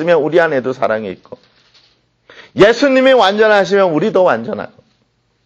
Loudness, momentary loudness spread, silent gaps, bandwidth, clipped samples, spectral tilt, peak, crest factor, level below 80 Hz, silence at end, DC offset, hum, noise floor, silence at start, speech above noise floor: -12 LUFS; 17 LU; none; 8 kHz; under 0.1%; -5.5 dB/octave; 0 dBFS; 14 dB; -52 dBFS; 0.8 s; under 0.1%; none; -60 dBFS; 0 s; 49 dB